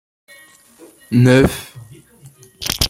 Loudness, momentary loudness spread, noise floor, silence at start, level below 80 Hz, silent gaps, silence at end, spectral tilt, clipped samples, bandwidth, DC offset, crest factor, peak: -15 LUFS; 18 LU; -46 dBFS; 1.1 s; -36 dBFS; none; 0 s; -5.5 dB/octave; under 0.1%; 16.5 kHz; under 0.1%; 18 dB; 0 dBFS